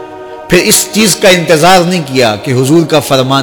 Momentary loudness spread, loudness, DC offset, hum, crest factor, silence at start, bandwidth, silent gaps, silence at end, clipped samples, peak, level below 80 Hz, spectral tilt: 6 LU; -7 LUFS; under 0.1%; none; 8 dB; 0 s; over 20 kHz; none; 0 s; 0.2%; 0 dBFS; -38 dBFS; -4 dB/octave